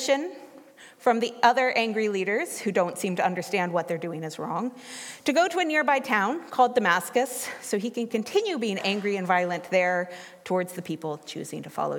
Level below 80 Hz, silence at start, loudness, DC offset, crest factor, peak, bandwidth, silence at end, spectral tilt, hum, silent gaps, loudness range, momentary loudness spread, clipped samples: -82 dBFS; 0 s; -26 LUFS; under 0.1%; 20 dB; -6 dBFS; 17.5 kHz; 0 s; -4 dB/octave; none; none; 3 LU; 12 LU; under 0.1%